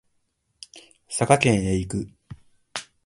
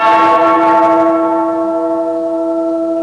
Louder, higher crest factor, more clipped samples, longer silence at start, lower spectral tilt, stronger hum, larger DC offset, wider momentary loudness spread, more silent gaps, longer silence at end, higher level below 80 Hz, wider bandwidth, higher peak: second, -22 LUFS vs -12 LUFS; first, 26 dB vs 8 dB; neither; first, 0.75 s vs 0 s; about the same, -5 dB/octave vs -6 dB/octave; second, none vs 60 Hz at -50 dBFS; second, under 0.1% vs 0.1%; first, 25 LU vs 7 LU; neither; first, 0.25 s vs 0 s; first, -46 dBFS vs -58 dBFS; first, 11.5 kHz vs 9.8 kHz; about the same, 0 dBFS vs -2 dBFS